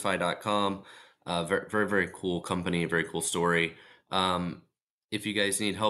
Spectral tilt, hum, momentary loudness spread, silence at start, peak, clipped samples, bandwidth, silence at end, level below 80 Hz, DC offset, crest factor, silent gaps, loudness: -4 dB/octave; none; 8 LU; 0 s; -12 dBFS; under 0.1%; 12.5 kHz; 0 s; -64 dBFS; under 0.1%; 18 dB; 4.82-5.09 s; -29 LUFS